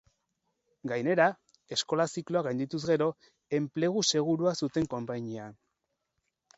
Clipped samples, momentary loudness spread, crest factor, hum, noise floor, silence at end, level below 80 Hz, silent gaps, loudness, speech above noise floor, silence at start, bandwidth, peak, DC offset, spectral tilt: under 0.1%; 11 LU; 22 dB; none; -82 dBFS; 1.05 s; -68 dBFS; none; -30 LUFS; 52 dB; 0.85 s; 8.2 kHz; -10 dBFS; under 0.1%; -4.5 dB/octave